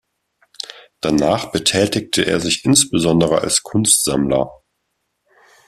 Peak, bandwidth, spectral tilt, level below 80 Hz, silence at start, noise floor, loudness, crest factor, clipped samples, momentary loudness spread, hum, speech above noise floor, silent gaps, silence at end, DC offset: 0 dBFS; 15.5 kHz; -3.5 dB/octave; -48 dBFS; 0.75 s; -72 dBFS; -16 LUFS; 18 dB; under 0.1%; 14 LU; none; 56 dB; none; 1.15 s; under 0.1%